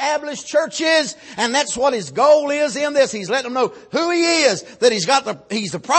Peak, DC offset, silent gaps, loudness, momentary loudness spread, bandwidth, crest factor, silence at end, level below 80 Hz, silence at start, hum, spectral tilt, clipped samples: -2 dBFS; under 0.1%; none; -18 LUFS; 9 LU; 8.8 kHz; 16 dB; 0 s; -62 dBFS; 0 s; none; -2.5 dB/octave; under 0.1%